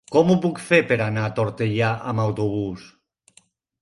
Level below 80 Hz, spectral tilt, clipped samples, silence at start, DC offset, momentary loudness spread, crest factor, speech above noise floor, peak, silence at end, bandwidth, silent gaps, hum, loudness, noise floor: -54 dBFS; -7 dB/octave; under 0.1%; 0.1 s; under 0.1%; 8 LU; 18 dB; 38 dB; -4 dBFS; 0.95 s; 11.5 kHz; none; none; -21 LUFS; -58 dBFS